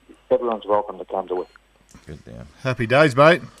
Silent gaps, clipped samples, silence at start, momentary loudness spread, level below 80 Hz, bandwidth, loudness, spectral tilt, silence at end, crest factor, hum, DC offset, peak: none; under 0.1%; 0.3 s; 19 LU; -52 dBFS; 12.5 kHz; -20 LUFS; -6 dB/octave; 0.15 s; 20 dB; none; under 0.1%; -2 dBFS